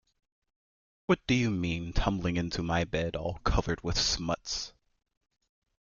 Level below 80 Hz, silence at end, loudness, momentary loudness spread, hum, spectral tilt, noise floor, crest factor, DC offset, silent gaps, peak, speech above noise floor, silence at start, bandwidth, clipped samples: -40 dBFS; 1.2 s; -30 LUFS; 7 LU; none; -4.5 dB/octave; under -90 dBFS; 20 dB; under 0.1%; none; -12 dBFS; over 60 dB; 1.1 s; 7.4 kHz; under 0.1%